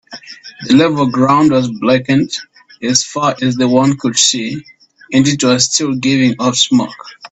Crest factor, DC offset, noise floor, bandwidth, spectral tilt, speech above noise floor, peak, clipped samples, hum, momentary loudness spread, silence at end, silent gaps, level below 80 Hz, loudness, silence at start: 14 dB; under 0.1%; -33 dBFS; 8.4 kHz; -4 dB/octave; 21 dB; 0 dBFS; under 0.1%; none; 14 LU; 0.05 s; none; -52 dBFS; -12 LUFS; 0.1 s